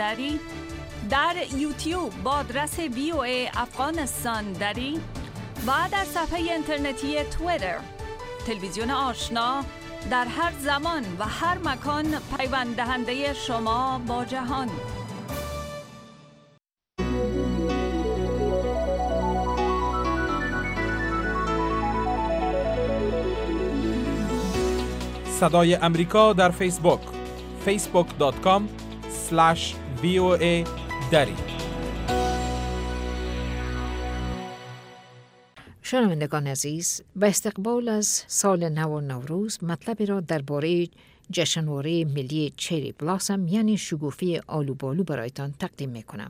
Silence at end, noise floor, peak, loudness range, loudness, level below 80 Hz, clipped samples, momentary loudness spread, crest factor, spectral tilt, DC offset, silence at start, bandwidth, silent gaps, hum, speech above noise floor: 0 s; -63 dBFS; -4 dBFS; 7 LU; -26 LUFS; -38 dBFS; under 0.1%; 11 LU; 22 dB; -4.5 dB/octave; under 0.1%; 0 s; 16 kHz; none; none; 38 dB